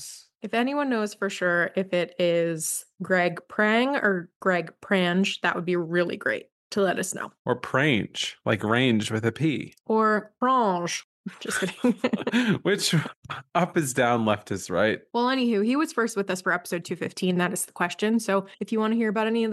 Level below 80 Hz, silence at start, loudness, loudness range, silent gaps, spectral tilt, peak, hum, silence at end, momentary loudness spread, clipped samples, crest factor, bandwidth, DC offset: -70 dBFS; 0 s; -25 LUFS; 2 LU; 4.36-4.40 s, 6.52-6.70 s, 7.39-7.45 s, 11.04-11.24 s, 13.16-13.22 s; -4.5 dB/octave; -8 dBFS; none; 0 s; 7 LU; under 0.1%; 18 dB; 12.5 kHz; under 0.1%